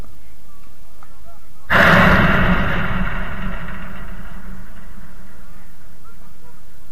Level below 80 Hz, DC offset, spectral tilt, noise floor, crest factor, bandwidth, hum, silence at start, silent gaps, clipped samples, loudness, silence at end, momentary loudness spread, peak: -30 dBFS; 10%; -6 dB/octave; -47 dBFS; 20 dB; 16 kHz; none; 1.7 s; none; under 0.1%; -15 LUFS; 1.3 s; 26 LU; -2 dBFS